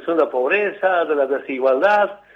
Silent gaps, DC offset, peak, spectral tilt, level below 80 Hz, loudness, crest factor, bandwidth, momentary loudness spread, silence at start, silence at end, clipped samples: none; under 0.1%; -4 dBFS; -5.5 dB/octave; -70 dBFS; -18 LUFS; 14 dB; 7 kHz; 5 LU; 0 s; 0.2 s; under 0.1%